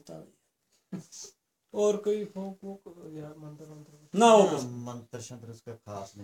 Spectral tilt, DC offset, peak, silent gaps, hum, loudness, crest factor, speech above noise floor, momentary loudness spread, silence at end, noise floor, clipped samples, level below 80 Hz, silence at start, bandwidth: -5 dB/octave; under 0.1%; -8 dBFS; none; none; -26 LUFS; 24 dB; 45 dB; 26 LU; 0 s; -74 dBFS; under 0.1%; -78 dBFS; 0.05 s; 15.5 kHz